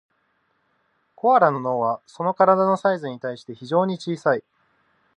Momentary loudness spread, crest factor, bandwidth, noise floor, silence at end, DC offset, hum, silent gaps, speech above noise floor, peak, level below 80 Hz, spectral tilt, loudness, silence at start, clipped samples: 12 LU; 20 dB; 9.2 kHz; -68 dBFS; 0.8 s; under 0.1%; none; none; 47 dB; -4 dBFS; -74 dBFS; -7 dB/octave; -21 LUFS; 1.25 s; under 0.1%